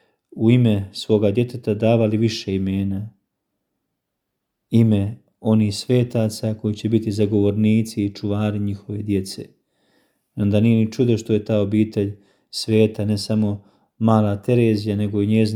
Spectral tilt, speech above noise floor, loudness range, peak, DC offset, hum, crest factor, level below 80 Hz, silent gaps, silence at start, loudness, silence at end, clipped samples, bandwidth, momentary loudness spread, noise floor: -7.5 dB/octave; 59 dB; 3 LU; -2 dBFS; under 0.1%; none; 18 dB; -58 dBFS; none; 0.35 s; -20 LUFS; 0 s; under 0.1%; 14 kHz; 9 LU; -78 dBFS